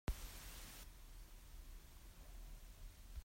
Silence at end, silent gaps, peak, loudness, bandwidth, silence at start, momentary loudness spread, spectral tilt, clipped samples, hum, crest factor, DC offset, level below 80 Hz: 0 s; none; -30 dBFS; -57 LUFS; 16 kHz; 0.05 s; 9 LU; -4 dB/octave; under 0.1%; none; 22 dB; under 0.1%; -54 dBFS